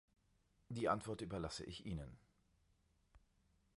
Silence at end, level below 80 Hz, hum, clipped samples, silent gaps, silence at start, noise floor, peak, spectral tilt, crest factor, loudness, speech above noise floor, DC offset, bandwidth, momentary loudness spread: 0.6 s; -64 dBFS; none; under 0.1%; none; 0.7 s; -78 dBFS; -24 dBFS; -5.5 dB/octave; 26 dB; -45 LUFS; 34 dB; under 0.1%; 11.5 kHz; 11 LU